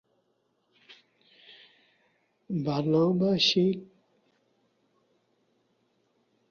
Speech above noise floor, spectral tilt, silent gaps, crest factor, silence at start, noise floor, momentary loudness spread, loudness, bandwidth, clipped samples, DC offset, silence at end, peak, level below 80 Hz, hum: 49 dB; -6 dB/octave; none; 20 dB; 0.9 s; -74 dBFS; 11 LU; -26 LUFS; 7 kHz; under 0.1%; under 0.1%; 2.65 s; -12 dBFS; -70 dBFS; none